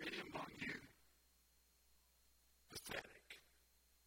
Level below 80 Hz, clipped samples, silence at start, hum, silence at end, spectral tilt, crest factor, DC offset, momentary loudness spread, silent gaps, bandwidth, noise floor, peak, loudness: -76 dBFS; under 0.1%; 0 s; none; 0.05 s; -3 dB/octave; 22 dB; under 0.1%; 13 LU; none; 16.5 kHz; -76 dBFS; -32 dBFS; -51 LUFS